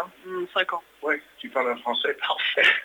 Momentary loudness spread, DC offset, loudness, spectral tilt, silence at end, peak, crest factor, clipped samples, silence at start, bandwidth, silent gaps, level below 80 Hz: 11 LU; under 0.1%; -25 LUFS; -2.5 dB/octave; 0 s; -6 dBFS; 20 dB; under 0.1%; 0 s; over 20 kHz; none; -74 dBFS